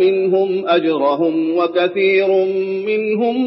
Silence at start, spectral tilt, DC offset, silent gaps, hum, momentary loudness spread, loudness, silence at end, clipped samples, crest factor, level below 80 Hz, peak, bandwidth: 0 s; -10 dB/octave; under 0.1%; none; none; 4 LU; -16 LUFS; 0 s; under 0.1%; 10 dB; -74 dBFS; -4 dBFS; 5.8 kHz